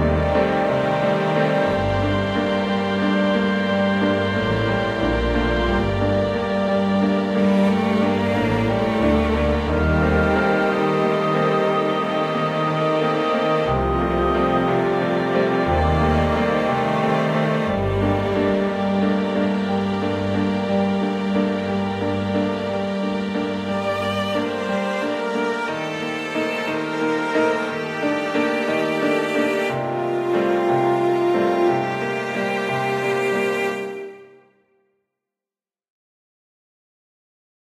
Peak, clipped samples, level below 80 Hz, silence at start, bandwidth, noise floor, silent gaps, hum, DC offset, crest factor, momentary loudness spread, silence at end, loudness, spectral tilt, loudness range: -6 dBFS; under 0.1%; -36 dBFS; 0 s; 13.5 kHz; under -90 dBFS; none; none; under 0.1%; 16 dB; 5 LU; 3.4 s; -20 LUFS; -7 dB/octave; 4 LU